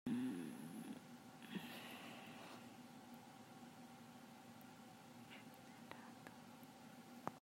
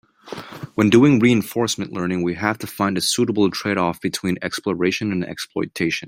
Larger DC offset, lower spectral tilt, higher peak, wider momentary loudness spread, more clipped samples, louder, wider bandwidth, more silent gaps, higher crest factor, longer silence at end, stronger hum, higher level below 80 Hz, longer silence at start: neither; about the same, -5 dB/octave vs -5 dB/octave; second, -26 dBFS vs -2 dBFS; second, 9 LU vs 12 LU; neither; second, -55 LUFS vs -20 LUFS; about the same, 16 kHz vs 16 kHz; neither; first, 28 dB vs 18 dB; about the same, 0 s vs 0 s; neither; second, -90 dBFS vs -58 dBFS; second, 0.05 s vs 0.25 s